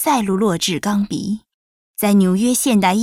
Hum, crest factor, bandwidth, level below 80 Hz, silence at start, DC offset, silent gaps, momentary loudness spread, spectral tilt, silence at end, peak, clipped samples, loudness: none; 14 dB; 16.5 kHz; -52 dBFS; 0 s; under 0.1%; 1.54-1.94 s; 11 LU; -4.5 dB/octave; 0 s; -4 dBFS; under 0.1%; -17 LUFS